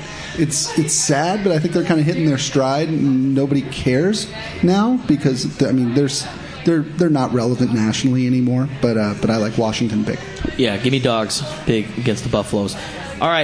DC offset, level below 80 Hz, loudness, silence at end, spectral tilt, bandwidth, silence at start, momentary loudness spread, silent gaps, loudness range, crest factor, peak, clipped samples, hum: under 0.1%; -42 dBFS; -18 LUFS; 0 s; -5 dB/octave; 10.5 kHz; 0 s; 5 LU; none; 2 LU; 14 dB; -2 dBFS; under 0.1%; none